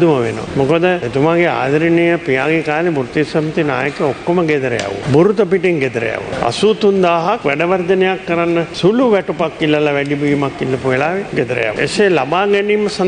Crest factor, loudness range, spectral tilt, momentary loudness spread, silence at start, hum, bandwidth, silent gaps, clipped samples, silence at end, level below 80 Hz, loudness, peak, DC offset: 14 dB; 1 LU; -6 dB/octave; 5 LU; 0 s; none; 9.8 kHz; none; under 0.1%; 0 s; -46 dBFS; -15 LUFS; -2 dBFS; under 0.1%